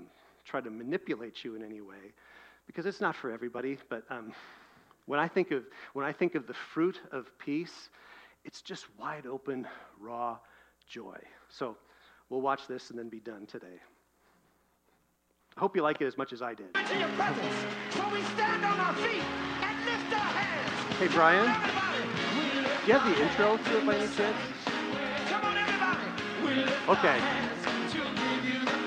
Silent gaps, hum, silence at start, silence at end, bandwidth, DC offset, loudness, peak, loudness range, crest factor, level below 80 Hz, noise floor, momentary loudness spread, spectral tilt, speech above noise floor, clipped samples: none; none; 0 s; 0 s; 14.5 kHz; under 0.1%; -31 LUFS; -10 dBFS; 14 LU; 22 dB; -70 dBFS; -72 dBFS; 19 LU; -4.5 dB/octave; 41 dB; under 0.1%